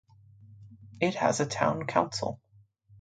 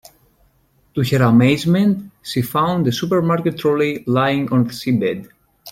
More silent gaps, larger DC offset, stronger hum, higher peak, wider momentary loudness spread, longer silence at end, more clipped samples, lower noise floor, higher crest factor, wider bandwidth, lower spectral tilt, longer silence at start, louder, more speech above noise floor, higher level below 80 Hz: neither; neither; neither; second, -8 dBFS vs -2 dBFS; about the same, 9 LU vs 10 LU; first, 0.65 s vs 0 s; neither; about the same, -60 dBFS vs -58 dBFS; first, 24 dB vs 16 dB; second, 9.4 kHz vs 16.5 kHz; second, -4.5 dB/octave vs -7 dB/octave; second, 0.4 s vs 0.95 s; second, -29 LUFS vs -17 LUFS; second, 32 dB vs 42 dB; second, -64 dBFS vs -52 dBFS